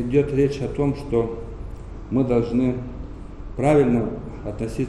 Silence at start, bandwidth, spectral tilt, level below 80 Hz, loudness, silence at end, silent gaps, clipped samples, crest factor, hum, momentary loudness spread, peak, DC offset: 0 s; 11.5 kHz; -8.5 dB/octave; -36 dBFS; -22 LUFS; 0 s; none; under 0.1%; 16 dB; none; 19 LU; -6 dBFS; under 0.1%